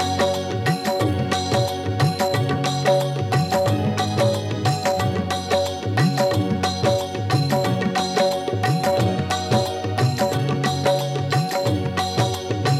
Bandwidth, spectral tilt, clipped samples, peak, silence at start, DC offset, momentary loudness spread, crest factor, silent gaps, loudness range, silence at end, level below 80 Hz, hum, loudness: 15.5 kHz; -5.5 dB/octave; under 0.1%; -4 dBFS; 0 s; under 0.1%; 3 LU; 16 dB; none; 1 LU; 0 s; -52 dBFS; none; -21 LUFS